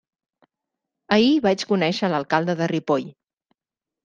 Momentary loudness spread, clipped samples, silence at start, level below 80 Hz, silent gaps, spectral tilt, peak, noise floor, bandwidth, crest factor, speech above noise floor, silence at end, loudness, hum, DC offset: 7 LU; under 0.1%; 1.1 s; -66 dBFS; none; -6 dB/octave; -2 dBFS; -89 dBFS; 9.2 kHz; 20 dB; 69 dB; 0.95 s; -21 LUFS; none; under 0.1%